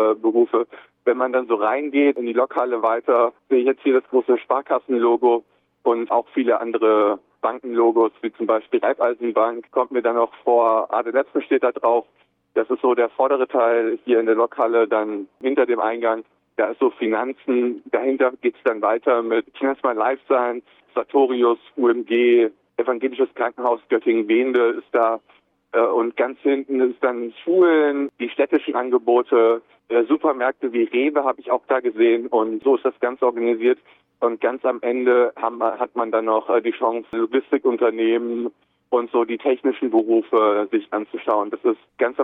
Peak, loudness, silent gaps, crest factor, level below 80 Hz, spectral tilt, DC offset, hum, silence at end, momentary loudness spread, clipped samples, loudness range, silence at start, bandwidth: -6 dBFS; -20 LUFS; none; 14 dB; -74 dBFS; -7.5 dB/octave; under 0.1%; none; 0 s; 6 LU; under 0.1%; 2 LU; 0 s; 3.9 kHz